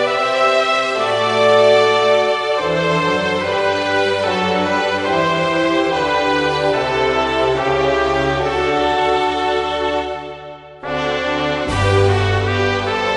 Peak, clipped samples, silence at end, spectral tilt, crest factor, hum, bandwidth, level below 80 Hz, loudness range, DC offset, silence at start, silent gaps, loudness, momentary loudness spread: -2 dBFS; under 0.1%; 0 s; -5 dB/octave; 14 dB; none; 11.5 kHz; -40 dBFS; 4 LU; under 0.1%; 0 s; none; -16 LUFS; 6 LU